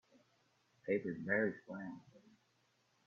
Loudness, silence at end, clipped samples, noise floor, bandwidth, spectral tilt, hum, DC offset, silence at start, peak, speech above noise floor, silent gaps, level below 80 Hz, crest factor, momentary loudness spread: -40 LUFS; 0.9 s; under 0.1%; -77 dBFS; 7.2 kHz; -7 dB/octave; none; under 0.1%; 0.85 s; -22 dBFS; 38 dB; none; -84 dBFS; 22 dB; 15 LU